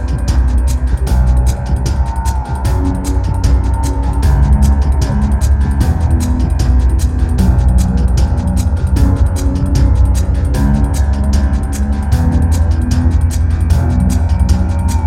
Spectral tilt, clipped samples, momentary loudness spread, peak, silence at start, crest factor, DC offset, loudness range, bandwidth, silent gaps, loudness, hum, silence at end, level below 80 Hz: -7 dB/octave; under 0.1%; 4 LU; 0 dBFS; 0 s; 10 dB; under 0.1%; 2 LU; 13.5 kHz; none; -14 LUFS; none; 0 s; -12 dBFS